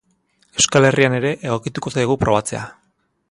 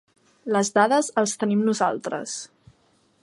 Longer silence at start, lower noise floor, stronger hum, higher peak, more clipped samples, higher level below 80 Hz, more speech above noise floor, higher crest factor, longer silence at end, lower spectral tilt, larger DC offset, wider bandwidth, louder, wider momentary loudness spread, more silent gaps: about the same, 0.55 s vs 0.45 s; about the same, -62 dBFS vs -63 dBFS; neither; first, 0 dBFS vs -4 dBFS; neither; first, -46 dBFS vs -70 dBFS; about the same, 44 dB vs 41 dB; about the same, 18 dB vs 20 dB; second, 0.6 s vs 0.75 s; about the same, -4 dB/octave vs -4 dB/octave; neither; about the same, 11.5 kHz vs 11.5 kHz; first, -18 LUFS vs -23 LUFS; about the same, 14 LU vs 14 LU; neither